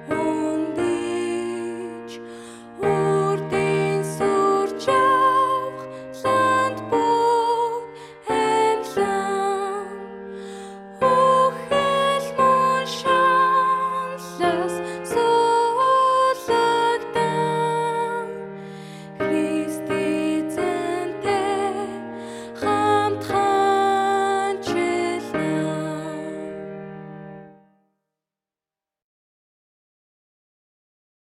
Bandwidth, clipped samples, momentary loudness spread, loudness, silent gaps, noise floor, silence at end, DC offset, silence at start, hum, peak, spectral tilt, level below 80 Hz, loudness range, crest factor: 15 kHz; under 0.1%; 17 LU; -21 LUFS; none; -90 dBFS; 3.85 s; under 0.1%; 0 s; none; -8 dBFS; -5 dB/octave; -60 dBFS; 6 LU; 16 dB